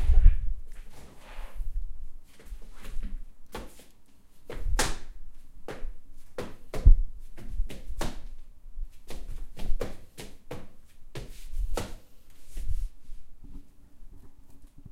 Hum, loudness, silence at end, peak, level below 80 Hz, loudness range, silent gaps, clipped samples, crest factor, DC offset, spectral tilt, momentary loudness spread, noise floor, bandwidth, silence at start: none; -35 LUFS; 0.05 s; -4 dBFS; -28 dBFS; 13 LU; none; under 0.1%; 22 dB; under 0.1%; -4.5 dB/octave; 25 LU; -49 dBFS; 12.5 kHz; 0 s